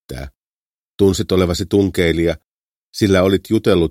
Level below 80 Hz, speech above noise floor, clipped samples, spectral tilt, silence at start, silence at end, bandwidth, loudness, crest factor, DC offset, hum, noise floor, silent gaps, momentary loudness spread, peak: -38 dBFS; over 75 dB; under 0.1%; -6 dB/octave; 0.1 s; 0 s; 16 kHz; -16 LUFS; 16 dB; under 0.1%; none; under -90 dBFS; 0.37-0.98 s, 2.45-2.93 s; 17 LU; 0 dBFS